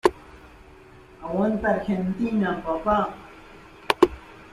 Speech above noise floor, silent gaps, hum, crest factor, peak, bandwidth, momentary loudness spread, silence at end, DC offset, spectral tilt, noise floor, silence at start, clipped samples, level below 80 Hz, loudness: 24 dB; none; none; 24 dB; -2 dBFS; 14 kHz; 22 LU; 0.05 s; under 0.1%; -6.5 dB/octave; -48 dBFS; 0.05 s; under 0.1%; -48 dBFS; -24 LUFS